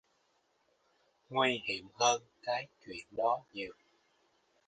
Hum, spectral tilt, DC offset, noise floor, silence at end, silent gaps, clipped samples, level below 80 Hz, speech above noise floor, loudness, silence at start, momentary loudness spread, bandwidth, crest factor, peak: none; -2 dB/octave; under 0.1%; -75 dBFS; 0.95 s; none; under 0.1%; -76 dBFS; 40 dB; -34 LUFS; 1.3 s; 14 LU; 9.4 kHz; 22 dB; -14 dBFS